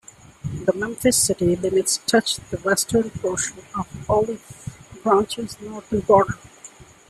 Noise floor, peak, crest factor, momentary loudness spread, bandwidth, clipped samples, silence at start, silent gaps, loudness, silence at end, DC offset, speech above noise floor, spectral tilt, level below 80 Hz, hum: -45 dBFS; -2 dBFS; 20 dB; 16 LU; 14.5 kHz; under 0.1%; 0.45 s; none; -21 LUFS; 0.25 s; under 0.1%; 24 dB; -3.5 dB/octave; -48 dBFS; none